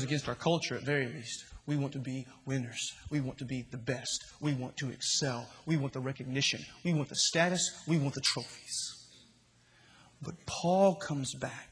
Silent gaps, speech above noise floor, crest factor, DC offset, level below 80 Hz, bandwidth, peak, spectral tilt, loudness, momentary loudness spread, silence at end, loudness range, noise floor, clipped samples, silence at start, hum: none; 31 dB; 22 dB; under 0.1%; -64 dBFS; 10.5 kHz; -12 dBFS; -4 dB/octave; -33 LUFS; 12 LU; 0.05 s; 5 LU; -65 dBFS; under 0.1%; 0 s; none